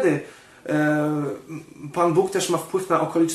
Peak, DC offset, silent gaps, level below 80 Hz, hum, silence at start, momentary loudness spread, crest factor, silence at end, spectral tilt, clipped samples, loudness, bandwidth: -6 dBFS; under 0.1%; none; -66 dBFS; none; 0 s; 17 LU; 16 dB; 0 s; -5.5 dB/octave; under 0.1%; -23 LUFS; 12.5 kHz